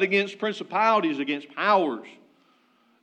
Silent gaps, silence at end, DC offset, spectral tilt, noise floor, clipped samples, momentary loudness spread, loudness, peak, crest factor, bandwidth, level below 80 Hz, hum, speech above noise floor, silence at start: none; 0.9 s; under 0.1%; -5 dB/octave; -63 dBFS; under 0.1%; 8 LU; -24 LUFS; -8 dBFS; 18 dB; 9.2 kHz; under -90 dBFS; none; 39 dB; 0 s